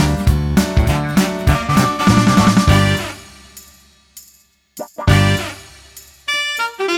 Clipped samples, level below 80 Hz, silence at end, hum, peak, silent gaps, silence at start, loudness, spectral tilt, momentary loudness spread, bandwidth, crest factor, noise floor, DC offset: under 0.1%; -26 dBFS; 0 s; none; 0 dBFS; none; 0 s; -15 LUFS; -5.5 dB/octave; 16 LU; 17.5 kHz; 16 dB; -52 dBFS; under 0.1%